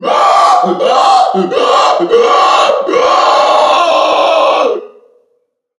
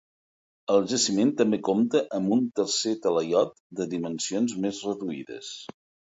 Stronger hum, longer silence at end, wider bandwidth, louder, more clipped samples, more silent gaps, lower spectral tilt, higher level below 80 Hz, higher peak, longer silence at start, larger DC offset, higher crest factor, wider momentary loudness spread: neither; first, 0.9 s vs 0.45 s; first, 11.5 kHz vs 8 kHz; first, -9 LUFS vs -26 LUFS; first, 0.2% vs under 0.1%; second, none vs 3.60-3.70 s; about the same, -3 dB/octave vs -4 dB/octave; first, -62 dBFS vs -70 dBFS; first, 0 dBFS vs -8 dBFS; second, 0 s vs 0.7 s; neither; second, 10 dB vs 18 dB; second, 4 LU vs 14 LU